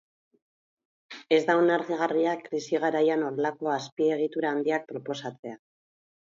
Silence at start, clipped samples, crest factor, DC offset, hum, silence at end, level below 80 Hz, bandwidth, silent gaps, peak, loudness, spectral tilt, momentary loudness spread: 1.1 s; under 0.1%; 20 dB; under 0.1%; none; 0.65 s; -82 dBFS; 7.6 kHz; 3.92-3.97 s, 5.39-5.43 s; -8 dBFS; -27 LUFS; -5.5 dB/octave; 13 LU